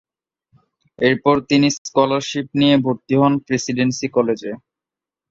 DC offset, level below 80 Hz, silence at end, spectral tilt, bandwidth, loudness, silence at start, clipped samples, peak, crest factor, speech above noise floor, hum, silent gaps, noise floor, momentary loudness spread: under 0.1%; -56 dBFS; 0.75 s; -5 dB/octave; 7.8 kHz; -18 LUFS; 1 s; under 0.1%; -2 dBFS; 18 dB; 70 dB; none; 1.78-1.85 s; -88 dBFS; 7 LU